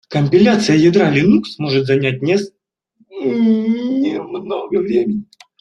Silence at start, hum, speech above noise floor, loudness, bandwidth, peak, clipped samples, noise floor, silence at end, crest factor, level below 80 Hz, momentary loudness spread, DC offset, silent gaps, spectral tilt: 0.1 s; none; 44 dB; -15 LUFS; 10.5 kHz; -2 dBFS; under 0.1%; -58 dBFS; 0.4 s; 14 dB; -54 dBFS; 12 LU; under 0.1%; none; -6.5 dB/octave